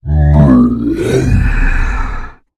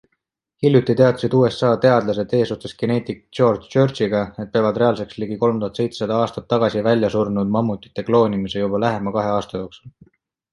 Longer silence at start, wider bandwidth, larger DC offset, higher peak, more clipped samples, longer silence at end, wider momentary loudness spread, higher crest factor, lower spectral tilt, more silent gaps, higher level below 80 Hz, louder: second, 0.05 s vs 0.6 s; about the same, 12 kHz vs 11.5 kHz; neither; about the same, 0 dBFS vs -2 dBFS; first, 0.3% vs under 0.1%; second, 0.25 s vs 0.65 s; first, 13 LU vs 8 LU; second, 10 dB vs 18 dB; about the same, -8 dB/octave vs -7.5 dB/octave; neither; first, -16 dBFS vs -52 dBFS; first, -12 LUFS vs -19 LUFS